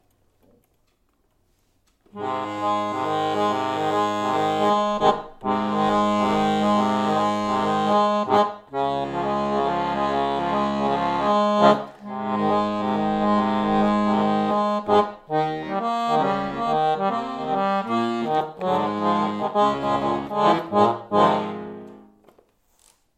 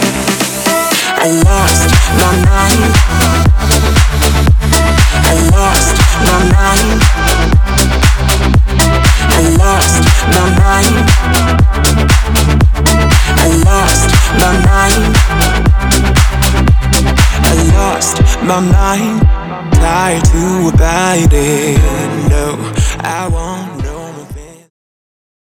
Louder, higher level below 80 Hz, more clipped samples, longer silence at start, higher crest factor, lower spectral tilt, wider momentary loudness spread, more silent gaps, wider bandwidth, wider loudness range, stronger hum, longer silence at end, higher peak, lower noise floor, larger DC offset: second, -22 LUFS vs -10 LUFS; second, -54 dBFS vs -12 dBFS; second, under 0.1% vs 1%; first, 2.15 s vs 0 s; first, 20 dB vs 8 dB; first, -6 dB/octave vs -4.5 dB/octave; about the same, 6 LU vs 4 LU; neither; second, 10 kHz vs over 20 kHz; about the same, 2 LU vs 3 LU; neither; about the same, 1.15 s vs 1.1 s; second, -4 dBFS vs 0 dBFS; first, -66 dBFS vs -28 dBFS; neither